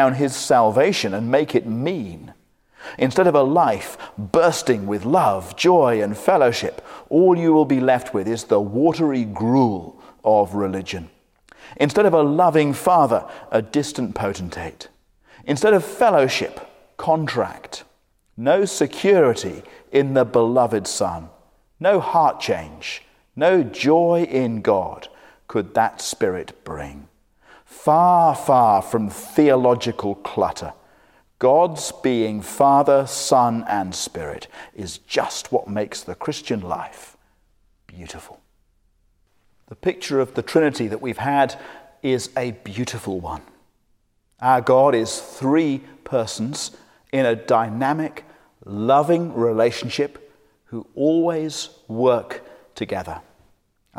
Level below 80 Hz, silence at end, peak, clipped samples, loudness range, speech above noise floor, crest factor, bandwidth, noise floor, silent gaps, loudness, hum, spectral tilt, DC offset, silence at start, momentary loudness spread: -54 dBFS; 0.75 s; -2 dBFS; under 0.1%; 7 LU; 45 dB; 18 dB; 16.5 kHz; -64 dBFS; none; -19 LUFS; none; -5.5 dB/octave; under 0.1%; 0 s; 17 LU